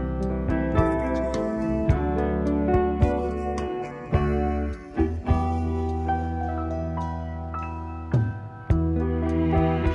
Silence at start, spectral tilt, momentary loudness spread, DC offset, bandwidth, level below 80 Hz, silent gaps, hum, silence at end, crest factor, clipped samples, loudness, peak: 0 s; -9 dB/octave; 8 LU; under 0.1%; 8.2 kHz; -32 dBFS; none; none; 0 s; 16 dB; under 0.1%; -26 LUFS; -8 dBFS